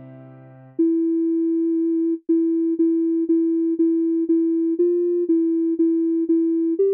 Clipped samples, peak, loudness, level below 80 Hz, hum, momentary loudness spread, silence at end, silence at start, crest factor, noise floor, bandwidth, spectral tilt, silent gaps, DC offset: under 0.1%; -12 dBFS; -20 LUFS; -82 dBFS; none; 2 LU; 0 s; 0 s; 8 dB; -44 dBFS; 1.7 kHz; -13.5 dB/octave; none; under 0.1%